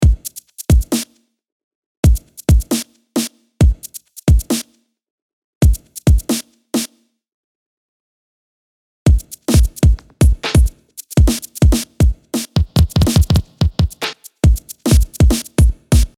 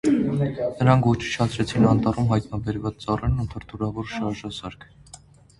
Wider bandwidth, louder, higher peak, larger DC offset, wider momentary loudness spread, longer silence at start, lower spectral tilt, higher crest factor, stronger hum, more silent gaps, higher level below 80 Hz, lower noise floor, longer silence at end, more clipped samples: first, 17 kHz vs 11.5 kHz; first, -16 LUFS vs -23 LUFS; about the same, 0 dBFS vs -2 dBFS; neither; second, 9 LU vs 12 LU; about the same, 0 s vs 0.05 s; second, -5.5 dB/octave vs -7 dB/octave; second, 14 dB vs 20 dB; neither; first, 1.52-2.03 s, 5.10-5.61 s, 7.34-9.06 s vs none; first, -18 dBFS vs -40 dBFS; second, -40 dBFS vs -49 dBFS; second, 0.1 s vs 0.45 s; neither